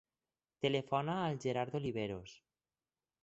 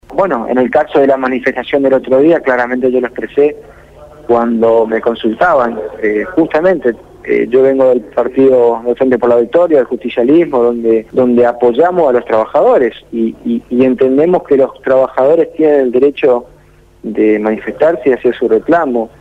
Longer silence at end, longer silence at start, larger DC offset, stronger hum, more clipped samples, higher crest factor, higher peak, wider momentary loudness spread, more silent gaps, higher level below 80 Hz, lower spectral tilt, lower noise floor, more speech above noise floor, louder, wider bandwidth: first, 0.85 s vs 0.15 s; first, 0.6 s vs 0.1 s; neither; neither; neither; first, 20 dB vs 10 dB; second, -20 dBFS vs -2 dBFS; about the same, 8 LU vs 7 LU; neither; second, -70 dBFS vs -46 dBFS; second, -5 dB/octave vs -8 dB/octave; first, under -90 dBFS vs -43 dBFS; first, over 53 dB vs 33 dB; second, -38 LUFS vs -11 LUFS; about the same, 8 kHz vs 7.8 kHz